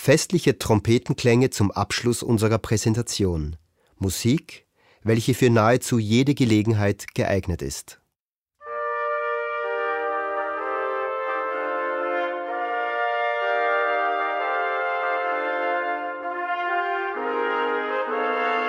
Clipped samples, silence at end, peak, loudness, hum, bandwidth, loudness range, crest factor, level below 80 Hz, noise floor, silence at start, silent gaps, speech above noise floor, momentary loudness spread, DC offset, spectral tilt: under 0.1%; 0 s; -4 dBFS; -23 LUFS; none; 16 kHz; 5 LU; 18 dB; -48 dBFS; -84 dBFS; 0 s; 8.20-8.46 s; 63 dB; 8 LU; under 0.1%; -5.5 dB/octave